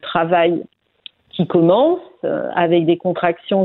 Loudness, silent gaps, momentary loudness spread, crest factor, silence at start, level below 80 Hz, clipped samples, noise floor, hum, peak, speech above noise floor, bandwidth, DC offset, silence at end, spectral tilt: -17 LUFS; none; 10 LU; 16 dB; 0.05 s; -60 dBFS; under 0.1%; -44 dBFS; none; 0 dBFS; 28 dB; 4.1 kHz; under 0.1%; 0 s; -11 dB/octave